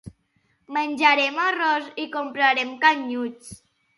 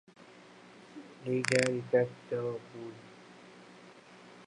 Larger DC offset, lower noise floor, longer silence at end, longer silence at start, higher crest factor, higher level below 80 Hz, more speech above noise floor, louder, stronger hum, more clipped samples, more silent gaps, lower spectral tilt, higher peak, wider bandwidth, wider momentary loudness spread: neither; first, -67 dBFS vs -55 dBFS; first, 0.45 s vs 0 s; second, 0.05 s vs 0.2 s; about the same, 22 dB vs 26 dB; first, -64 dBFS vs -78 dBFS; first, 45 dB vs 23 dB; first, -21 LUFS vs -32 LUFS; second, none vs 60 Hz at -55 dBFS; neither; neither; second, -3 dB/octave vs -5 dB/octave; first, -2 dBFS vs -10 dBFS; about the same, 11.5 kHz vs 11.5 kHz; second, 12 LU vs 25 LU